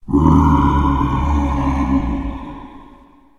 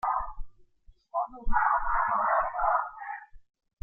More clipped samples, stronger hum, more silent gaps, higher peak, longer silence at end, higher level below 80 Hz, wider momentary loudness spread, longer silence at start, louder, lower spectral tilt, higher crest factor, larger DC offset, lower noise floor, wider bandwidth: neither; neither; neither; first, 0 dBFS vs -12 dBFS; first, 0.55 s vs 0.4 s; first, -22 dBFS vs -40 dBFS; first, 17 LU vs 14 LU; about the same, 0.05 s vs 0.05 s; first, -16 LUFS vs -28 LUFS; about the same, -8.5 dB/octave vs -8 dB/octave; about the same, 16 dB vs 16 dB; neither; second, -45 dBFS vs -58 dBFS; first, 7.4 kHz vs 2.7 kHz